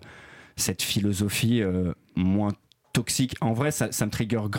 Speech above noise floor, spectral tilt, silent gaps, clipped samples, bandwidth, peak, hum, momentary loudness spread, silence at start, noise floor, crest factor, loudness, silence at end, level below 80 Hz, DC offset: 23 dB; -4.5 dB/octave; none; under 0.1%; 17 kHz; -12 dBFS; none; 6 LU; 0 s; -48 dBFS; 16 dB; -26 LUFS; 0 s; -54 dBFS; under 0.1%